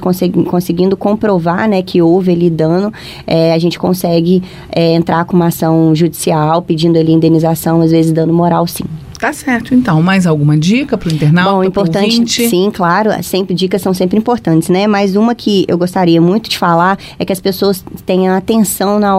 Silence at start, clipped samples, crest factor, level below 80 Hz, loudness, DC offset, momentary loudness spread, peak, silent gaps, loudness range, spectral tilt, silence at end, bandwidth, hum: 0 s; under 0.1%; 10 dB; -42 dBFS; -11 LUFS; under 0.1%; 5 LU; 0 dBFS; none; 1 LU; -6 dB/octave; 0 s; 16 kHz; none